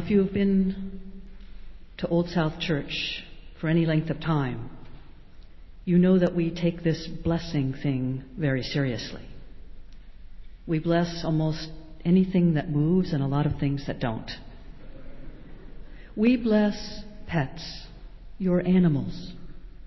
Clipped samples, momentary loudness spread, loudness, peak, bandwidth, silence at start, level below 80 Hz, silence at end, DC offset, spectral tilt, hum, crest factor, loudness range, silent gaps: under 0.1%; 19 LU; -26 LUFS; -10 dBFS; 6 kHz; 0 s; -44 dBFS; 0 s; under 0.1%; -8 dB/octave; none; 16 dB; 5 LU; none